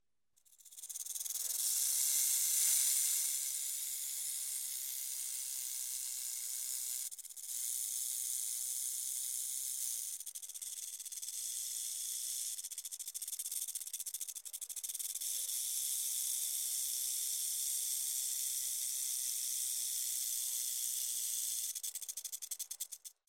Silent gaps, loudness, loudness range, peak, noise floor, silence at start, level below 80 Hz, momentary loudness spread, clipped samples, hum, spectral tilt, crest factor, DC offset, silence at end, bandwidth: none; -36 LUFS; 7 LU; -18 dBFS; -75 dBFS; 0.5 s; under -90 dBFS; 11 LU; under 0.1%; none; 6 dB/octave; 20 dB; under 0.1%; 0.15 s; 17.5 kHz